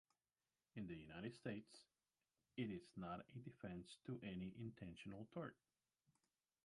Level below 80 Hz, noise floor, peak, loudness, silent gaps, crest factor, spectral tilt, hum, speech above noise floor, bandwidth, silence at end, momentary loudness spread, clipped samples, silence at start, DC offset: -78 dBFS; under -90 dBFS; -34 dBFS; -54 LUFS; none; 20 dB; -7 dB/octave; none; over 37 dB; 11 kHz; 1.1 s; 7 LU; under 0.1%; 0.75 s; under 0.1%